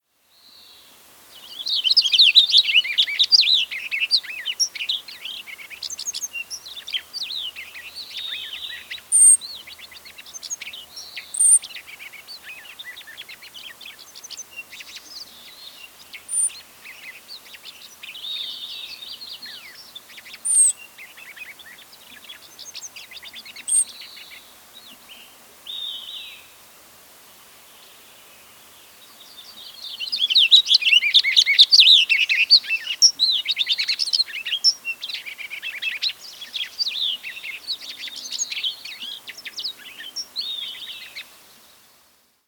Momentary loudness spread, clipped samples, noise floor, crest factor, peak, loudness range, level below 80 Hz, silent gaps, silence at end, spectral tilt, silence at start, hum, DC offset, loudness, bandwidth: 26 LU; under 0.1%; -59 dBFS; 22 dB; -2 dBFS; 22 LU; -74 dBFS; none; 1.25 s; 5 dB/octave; 1.35 s; none; under 0.1%; -17 LUFS; over 20 kHz